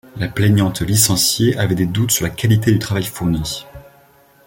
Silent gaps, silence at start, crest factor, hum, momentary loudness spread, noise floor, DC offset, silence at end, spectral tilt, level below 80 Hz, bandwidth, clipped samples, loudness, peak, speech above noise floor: none; 0.15 s; 16 dB; none; 8 LU; -50 dBFS; under 0.1%; 0.65 s; -4.5 dB/octave; -40 dBFS; 17 kHz; under 0.1%; -16 LUFS; 0 dBFS; 34 dB